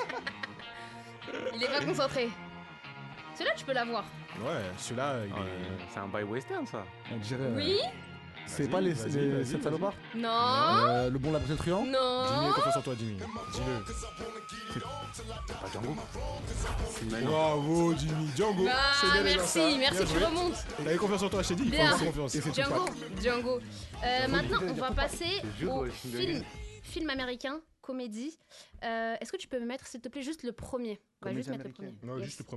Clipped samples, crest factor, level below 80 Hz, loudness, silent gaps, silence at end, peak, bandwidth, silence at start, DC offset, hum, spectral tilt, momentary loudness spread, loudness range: under 0.1%; 20 dB; -48 dBFS; -32 LUFS; none; 0 s; -12 dBFS; 12.5 kHz; 0 s; under 0.1%; none; -4.5 dB/octave; 16 LU; 11 LU